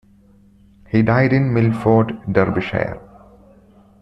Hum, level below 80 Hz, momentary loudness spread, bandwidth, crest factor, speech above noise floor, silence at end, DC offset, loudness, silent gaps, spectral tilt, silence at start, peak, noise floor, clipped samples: none; -46 dBFS; 8 LU; 5.8 kHz; 16 dB; 34 dB; 1 s; under 0.1%; -17 LUFS; none; -9.5 dB/octave; 0.95 s; -2 dBFS; -50 dBFS; under 0.1%